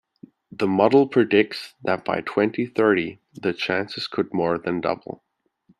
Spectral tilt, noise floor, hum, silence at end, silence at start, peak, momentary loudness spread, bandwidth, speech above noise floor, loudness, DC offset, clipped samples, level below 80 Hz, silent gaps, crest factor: -6.5 dB/octave; -62 dBFS; none; 0.65 s; 0.6 s; -2 dBFS; 12 LU; 12 kHz; 40 dB; -22 LUFS; under 0.1%; under 0.1%; -64 dBFS; none; 20 dB